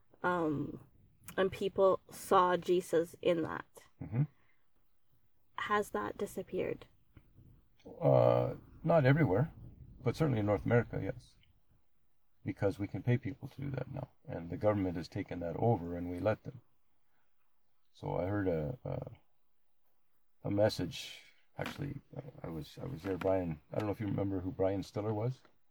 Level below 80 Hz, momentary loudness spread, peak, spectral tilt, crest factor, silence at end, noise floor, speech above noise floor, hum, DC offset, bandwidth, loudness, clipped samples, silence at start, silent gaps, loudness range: -60 dBFS; 16 LU; -14 dBFS; -7 dB/octave; 20 dB; 0.35 s; -81 dBFS; 47 dB; none; under 0.1%; over 20 kHz; -35 LUFS; under 0.1%; 0.25 s; none; 8 LU